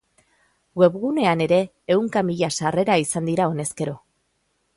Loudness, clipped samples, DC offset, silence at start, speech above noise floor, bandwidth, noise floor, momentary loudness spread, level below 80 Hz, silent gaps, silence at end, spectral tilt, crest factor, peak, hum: -21 LUFS; under 0.1%; under 0.1%; 0.75 s; 49 dB; 11.5 kHz; -70 dBFS; 10 LU; -60 dBFS; none; 0.8 s; -5 dB/octave; 18 dB; -4 dBFS; none